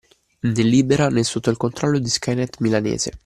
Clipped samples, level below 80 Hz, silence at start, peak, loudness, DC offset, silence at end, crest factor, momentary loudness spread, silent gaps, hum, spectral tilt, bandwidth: under 0.1%; -48 dBFS; 0.45 s; -4 dBFS; -20 LUFS; under 0.1%; 0.1 s; 16 dB; 7 LU; none; none; -5 dB/octave; 13 kHz